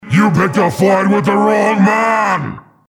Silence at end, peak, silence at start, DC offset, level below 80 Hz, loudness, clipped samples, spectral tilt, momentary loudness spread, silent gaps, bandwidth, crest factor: 0.3 s; 0 dBFS; 0.05 s; under 0.1%; -50 dBFS; -12 LUFS; under 0.1%; -6.5 dB/octave; 4 LU; none; 17.5 kHz; 12 dB